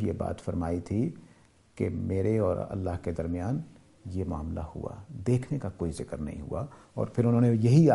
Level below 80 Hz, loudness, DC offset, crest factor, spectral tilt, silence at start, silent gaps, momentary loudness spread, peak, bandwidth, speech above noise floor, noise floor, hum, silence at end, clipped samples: -48 dBFS; -30 LUFS; under 0.1%; 20 dB; -9 dB/octave; 0 s; none; 14 LU; -8 dBFS; 11.5 kHz; 30 dB; -58 dBFS; none; 0 s; under 0.1%